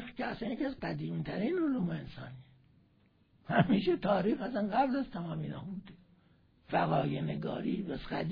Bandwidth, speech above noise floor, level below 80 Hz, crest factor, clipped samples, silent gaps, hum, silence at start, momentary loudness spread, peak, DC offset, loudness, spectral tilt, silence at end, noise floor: 5.2 kHz; 35 dB; -60 dBFS; 22 dB; under 0.1%; none; none; 0 s; 13 LU; -12 dBFS; under 0.1%; -34 LUFS; -6 dB/octave; 0 s; -68 dBFS